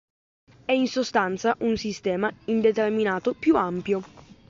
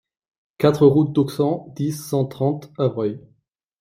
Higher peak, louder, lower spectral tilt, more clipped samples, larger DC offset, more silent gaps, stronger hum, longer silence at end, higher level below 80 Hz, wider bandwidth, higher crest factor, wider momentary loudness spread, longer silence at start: second, -8 dBFS vs -2 dBFS; second, -24 LUFS vs -20 LUFS; second, -5.5 dB/octave vs -7.5 dB/octave; neither; neither; neither; neither; second, 0.3 s vs 0.65 s; about the same, -58 dBFS vs -58 dBFS; second, 7.6 kHz vs 16 kHz; about the same, 16 dB vs 18 dB; second, 6 LU vs 11 LU; about the same, 0.7 s vs 0.6 s